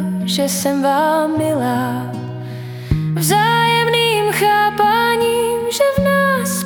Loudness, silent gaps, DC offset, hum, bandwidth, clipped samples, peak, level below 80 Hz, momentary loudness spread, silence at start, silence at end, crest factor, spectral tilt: -15 LUFS; none; under 0.1%; none; 18 kHz; under 0.1%; -2 dBFS; -40 dBFS; 10 LU; 0 s; 0 s; 14 dB; -4.5 dB/octave